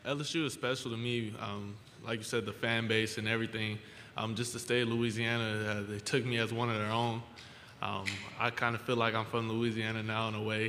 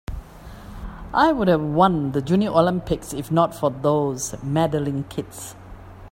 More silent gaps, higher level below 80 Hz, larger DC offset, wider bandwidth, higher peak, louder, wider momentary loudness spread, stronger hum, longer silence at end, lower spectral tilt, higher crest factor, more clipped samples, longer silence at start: neither; second, -68 dBFS vs -42 dBFS; neither; about the same, 15.5 kHz vs 16.5 kHz; second, -14 dBFS vs -2 dBFS; second, -34 LUFS vs -21 LUFS; second, 9 LU vs 20 LU; neither; about the same, 0 s vs 0.05 s; second, -4.5 dB/octave vs -6 dB/octave; about the same, 22 dB vs 18 dB; neither; about the same, 0 s vs 0.1 s